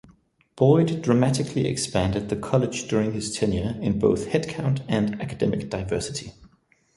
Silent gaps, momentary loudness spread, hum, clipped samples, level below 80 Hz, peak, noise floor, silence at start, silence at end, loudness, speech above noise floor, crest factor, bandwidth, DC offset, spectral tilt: none; 7 LU; none; under 0.1%; -46 dBFS; -4 dBFS; -61 dBFS; 0.55 s; 0.5 s; -24 LUFS; 37 dB; 20 dB; 11.5 kHz; under 0.1%; -6 dB/octave